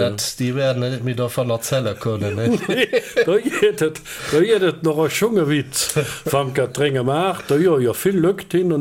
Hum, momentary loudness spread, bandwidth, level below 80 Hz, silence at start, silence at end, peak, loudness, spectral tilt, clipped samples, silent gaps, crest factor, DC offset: none; 6 LU; 17 kHz; -54 dBFS; 0 s; 0 s; -4 dBFS; -19 LUFS; -5 dB/octave; under 0.1%; none; 14 dB; under 0.1%